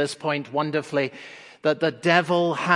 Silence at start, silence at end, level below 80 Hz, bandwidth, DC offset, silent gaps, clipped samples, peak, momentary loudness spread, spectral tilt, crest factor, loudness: 0 s; 0 s; -74 dBFS; 11.5 kHz; under 0.1%; none; under 0.1%; -2 dBFS; 10 LU; -5.5 dB/octave; 22 dB; -23 LUFS